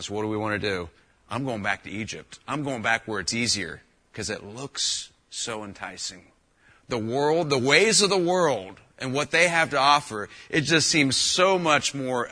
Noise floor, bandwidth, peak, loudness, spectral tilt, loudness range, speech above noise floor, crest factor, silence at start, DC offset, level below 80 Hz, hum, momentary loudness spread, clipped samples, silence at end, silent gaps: -59 dBFS; 10.5 kHz; -4 dBFS; -23 LUFS; -3 dB/octave; 8 LU; 35 dB; 22 dB; 0 s; under 0.1%; -58 dBFS; none; 15 LU; under 0.1%; 0 s; none